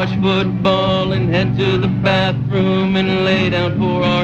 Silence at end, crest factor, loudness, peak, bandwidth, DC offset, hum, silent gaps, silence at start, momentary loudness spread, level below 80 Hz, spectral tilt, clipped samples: 0 s; 12 dB; -16 LUFS; -2 dBFS; 7.6 kHz; under 0.1%; none; none; 0 s; 2 LU; -38 dBFS; -7.5 dB/octave; under 0.1%